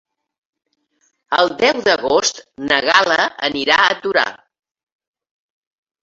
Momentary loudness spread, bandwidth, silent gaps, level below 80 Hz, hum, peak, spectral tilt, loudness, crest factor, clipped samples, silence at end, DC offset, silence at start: 7 LU; 8 kHz; none; -58 dBFS; none; 0 dBFS; -1.5 dB/octave; -15 LUFS; 18 dB; under 0.1%; 1.65 s; under 0.1%; 1.3 s